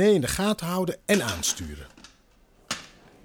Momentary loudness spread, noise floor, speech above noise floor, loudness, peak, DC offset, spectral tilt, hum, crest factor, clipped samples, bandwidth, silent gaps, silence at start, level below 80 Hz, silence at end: 16 LU; -59 dBFS; 34 dB; -26 LUFS; -10 dBFS; under 0.1%; -4 dB/octave; none; 18 dB; under 0.1%; 18.5 kHz; none; 0 s; -48 dBFS; 0.4 s